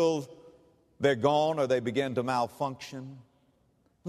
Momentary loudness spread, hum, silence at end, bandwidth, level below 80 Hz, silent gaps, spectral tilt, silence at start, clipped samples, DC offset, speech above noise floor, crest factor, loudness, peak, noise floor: 17 LU; none; 0 s; 13.5 kHz; -70 dBFS; none; -5.5 dB/octave; 0 s; under 0.1%; under 0.1%; 40 dB; 20 dB; -29 LUFS; -10 dBFS; -69 dBFS